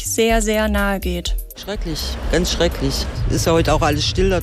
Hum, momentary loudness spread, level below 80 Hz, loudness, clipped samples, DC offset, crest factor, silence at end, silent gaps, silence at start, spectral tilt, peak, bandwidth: none; 9 LU; -24 dBFS; -19 LUFS; under 0.1%; under 0.1%; 14 dB; 0 s; none; 0 s; -4.5 dB/octave; -6 dBFS; 15.5 kHz